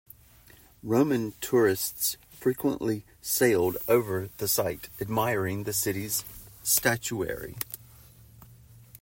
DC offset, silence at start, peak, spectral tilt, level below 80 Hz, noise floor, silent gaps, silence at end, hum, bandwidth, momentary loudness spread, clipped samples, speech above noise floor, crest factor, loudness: under 0.1%; 0.85 s; -8 dBFS; -4 dB/octave; -58 dBFS; -55 dBFS; none; 0.05 s; none; 16.5 kHz; 11 LU; under 0.1%; 28 dB; 20 dB; -27 LUFS